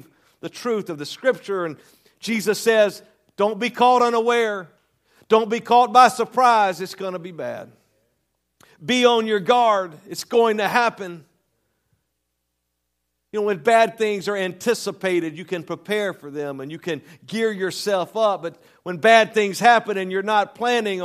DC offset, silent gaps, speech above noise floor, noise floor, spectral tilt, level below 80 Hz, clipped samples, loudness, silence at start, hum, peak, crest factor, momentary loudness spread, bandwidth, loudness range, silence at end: under 0.1%; none; 56 dB; -76 dBFS; -4 dB/octave; -76 dBFS; under 0.1%; -20 LUFS; 0.45 s; none; 0 dBFS; 22 dB; 15 LU; 15 kHz; 7 LU; 0 s